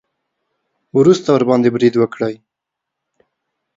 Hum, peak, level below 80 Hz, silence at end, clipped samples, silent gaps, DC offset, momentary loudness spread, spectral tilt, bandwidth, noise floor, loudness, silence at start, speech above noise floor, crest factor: none; 0 dBFS; -60 dBFS; 1.45 s; under 0.1%; none; under 0.1%; 9 LU; -7 dB/octave; 7.8 kHz; -81 dBFS; -14 LUFS; 0.95 s; 68 dB; 16 dB